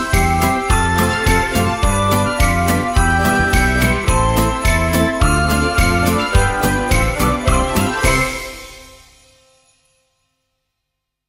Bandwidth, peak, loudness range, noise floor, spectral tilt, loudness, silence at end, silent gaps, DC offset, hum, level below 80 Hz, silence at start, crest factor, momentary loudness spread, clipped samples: 16.5 kHz; 0 dBFS; 6 LU; -77 dBFS; -4.5 dB/octave; -15 LUFS; 2.4 s; none; under 0.1%; none; -22 dBFS; 0 s; 16 dB; 2 LU; under 0.1%